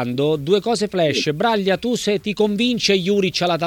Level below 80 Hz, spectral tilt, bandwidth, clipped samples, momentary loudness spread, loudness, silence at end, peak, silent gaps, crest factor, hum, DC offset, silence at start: -54 dBFS; -4.5 dB/octave; 17.5 kHz; under 0.1%; 3 LU; -19 LUFS; 0 s; -4 dBFS; none; 14 dB; none; under 0.1%; 0 s